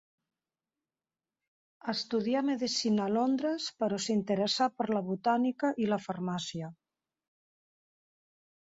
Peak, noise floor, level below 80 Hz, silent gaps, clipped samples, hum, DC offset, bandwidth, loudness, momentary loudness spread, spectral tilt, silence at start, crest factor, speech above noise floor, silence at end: -16 dBFS; under -90 dBFS; -76 dBFS; none; under 0.1%; none; under 0.1%; 7.8 kHz; -31 LUFS; 7 LU; -5 dB/octave; 1.85 s; 16 dB; over 59 dB; 2 s